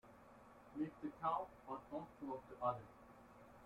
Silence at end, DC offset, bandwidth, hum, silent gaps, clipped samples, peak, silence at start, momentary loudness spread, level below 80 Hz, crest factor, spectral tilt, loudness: 0 s; under 0.1%; 16 kHz; none; none; under 0.1%; -28 dBFS; 0.05 s; 20 LU; -76 dBFS; 20 dB; -8 dB/octave; -47 LUFS